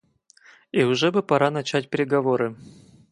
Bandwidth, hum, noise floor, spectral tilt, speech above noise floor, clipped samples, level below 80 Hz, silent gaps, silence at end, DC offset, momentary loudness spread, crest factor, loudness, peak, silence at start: 11 kHz; none; -55 dBFS; -5.5 dB/octave; 33 dB; under 0.1%; -68 dBFS; none; 0.45 s; under 0.1%; 6 LU; 20 dB; -22 LUFS; -4 dBFS; 0.75 s